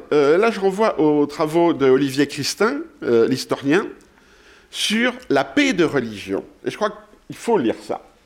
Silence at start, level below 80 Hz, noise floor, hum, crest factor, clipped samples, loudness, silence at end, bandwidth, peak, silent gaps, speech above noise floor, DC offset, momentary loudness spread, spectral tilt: 0 s; -56 dBFS; -50 dBFS; none; 14 dB; under 0.1%; -19 LUFS; 0.25 s; 16.5 kHz; -6 dBFS; none; 31 dB; under 0.1%; 11 LU; -4.5 dB/octave